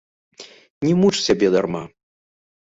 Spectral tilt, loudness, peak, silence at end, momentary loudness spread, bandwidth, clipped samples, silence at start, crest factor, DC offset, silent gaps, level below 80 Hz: -5.5 dB/octave; -19 LUFS; -4 dBFS; 0.8 s; 13 LU; 8 kHz; under 0.1%; 0.4 s; 18 dB; under 0.1%; 0.70-0.81 s; -54 dBFS